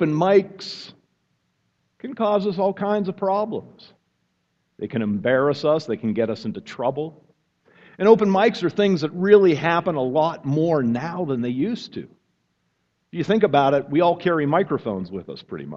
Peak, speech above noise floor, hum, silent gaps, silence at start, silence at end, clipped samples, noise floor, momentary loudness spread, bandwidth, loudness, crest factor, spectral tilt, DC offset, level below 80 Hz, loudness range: 0 dBFS; 50 dB; none; none; 0 s; 0 s; under 0.1%; -71 dBFS; 17 LU; 7.6 kHz; -21 LUFS; 22 dB; -7.5 dB/octave; under 0.1%; -64 dBFS; 7 LU